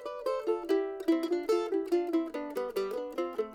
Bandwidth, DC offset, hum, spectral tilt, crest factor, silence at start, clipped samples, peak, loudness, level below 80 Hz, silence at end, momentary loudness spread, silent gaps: 17 kHz; under 0.1%; none; -4.5 dB/octave; 14 dB; 0 s; under 0.1%; -18 dBFS; -32 LUFS; -68 dBFS; 0 s; 5 LU; none